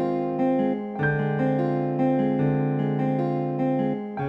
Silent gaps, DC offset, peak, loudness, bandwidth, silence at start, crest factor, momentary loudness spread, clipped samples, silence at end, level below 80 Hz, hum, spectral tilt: none; under 0.1%; -12 dBFS; -24 LUFS; 5 kHz; 0 s; 12 dB; 3 LU; under 0.1%; 0 s; -56 dBFS; none; -10.5 dB/octave